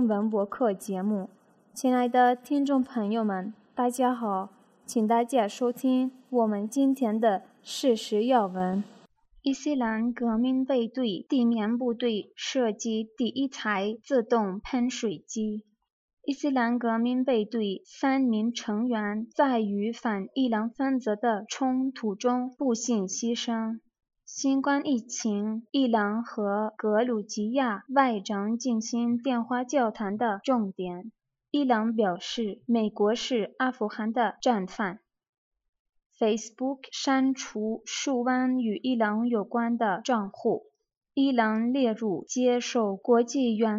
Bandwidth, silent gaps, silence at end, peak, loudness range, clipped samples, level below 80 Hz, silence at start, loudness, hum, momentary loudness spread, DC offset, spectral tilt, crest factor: 14 kHz; 15.92-16.17 s, 35.29-35.51 s, 35.69-35.73 s, 35.79-35.93 s, 36.06-36.10 s, 40.97-41.01 s; 0 s; -10 dBFS; 2 LU; under 0.1%; -70 dBFS; 0 s; -28 LUFS; none; 7 LU; under 0.1%; -4.5 dB/octave; 18 dB